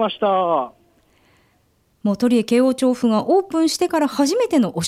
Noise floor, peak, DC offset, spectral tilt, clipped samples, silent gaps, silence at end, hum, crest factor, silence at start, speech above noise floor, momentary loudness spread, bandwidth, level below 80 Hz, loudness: -61 dBFS; -6 dBFS; under 0.1%; -5 dB/octave; under 0.1%; none; 0 s; none; 14 dB; 0 s; 44 dB; 6 LU; 15.5 kHz; -62 dBFS; -18 LUFS